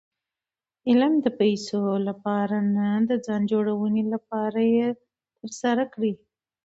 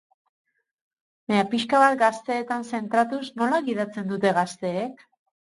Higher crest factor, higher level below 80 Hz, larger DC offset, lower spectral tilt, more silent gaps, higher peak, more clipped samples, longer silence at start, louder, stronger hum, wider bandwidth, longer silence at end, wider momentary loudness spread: about the same, 16 dB vs 20 dB; about the same, -70 dBFS vs -70 dBFS; neither; first, -6.5 dB/octave vs -5 dB/octave; neither; second, -8 dBFS vs -4 dBFS; neither; second, 0.85 s vs 1.3 s; about the same, -24 LUFS vs -24 LUFS; neither; second, 8 kHz vs 11.5 kHz; about the same, 0.5 s vs 0.6 s; second, 7 LU vs 10 LU